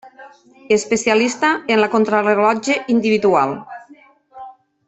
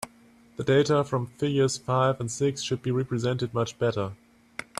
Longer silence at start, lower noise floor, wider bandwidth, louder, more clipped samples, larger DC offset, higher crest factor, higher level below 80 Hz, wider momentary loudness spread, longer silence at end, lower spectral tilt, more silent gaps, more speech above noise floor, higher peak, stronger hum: about the same, 0.05 s vs 0 s; second, -47 dBFS vs -56 dBFS; second, 8.4 kHz vs 13.5 kHz; first, -16 LUFS vs -26 LUFS; neither; neither; about the same, 16 dB vs 16 dB; about the same, -62 dBFS vs -60 dBFS; second, 6 LU vs 12 LU; first, 0.35 s vs 0.15 s; second, -4 dB/octave vs -5.5 dB/octave; neither; about the same, 32 dB vs 30 dB; first, -2 dBFS vs -10 dBFS; neither